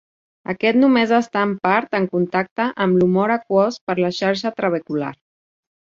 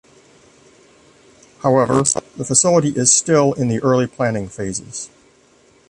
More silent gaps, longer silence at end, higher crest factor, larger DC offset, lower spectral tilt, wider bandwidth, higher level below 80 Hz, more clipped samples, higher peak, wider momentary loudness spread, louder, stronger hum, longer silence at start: first, 2.51-2.56 s, 3.81-3.87 s vs none; second, 0.7 s vs 0.85 s; about the same, 18 dB vs 18 dB; neither; first, -6.5 dB/octave vs -4 dB/octave; second, 7.4 kHz vs 11.5 kHz; second, -62 dBFS vs -52 dBFS; neither; about the same, -2 dBFS vs 0 dBFS; second, 8 LU vs 13 LU; second, -19 LUFS vs -16 LUFS; neither; second, 0.5 s vs 1.65 s